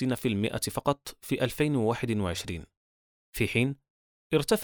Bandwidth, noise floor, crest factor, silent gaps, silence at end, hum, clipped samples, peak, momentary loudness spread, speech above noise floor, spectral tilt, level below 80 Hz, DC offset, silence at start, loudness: over 20 kHz; under -90 dBFS; 18 dB; 2.77-3.33 s, 3.90-4.30 s; 0 s; none; under 0.1%; -10 dBFS; 10 LU; over 61 dB; -5.5 dB/octave; -54 dBFS; under 0.1%; 0 s; -29 LUFS